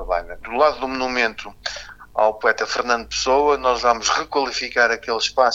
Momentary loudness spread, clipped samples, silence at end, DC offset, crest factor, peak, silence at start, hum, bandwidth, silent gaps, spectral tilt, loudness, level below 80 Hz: 11 LU; under 0.1%; 0 s; under 0.1%; 20 dB; 0 dBFS; 0 s; none; 8 kHz; none; -1.5 dB/octave; -20 LUFS; -44 dBFS